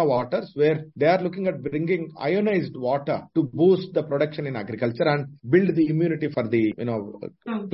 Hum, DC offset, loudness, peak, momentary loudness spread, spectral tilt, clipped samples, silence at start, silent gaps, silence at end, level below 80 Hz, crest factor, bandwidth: none; under 0.1%; -24 LUFS; -6 dBFS; 9 LU; -11.5 dB/octave; under 0.1%; 0 s; none; 0 s; -64 dBFS; 16 dB; 5.8 kHz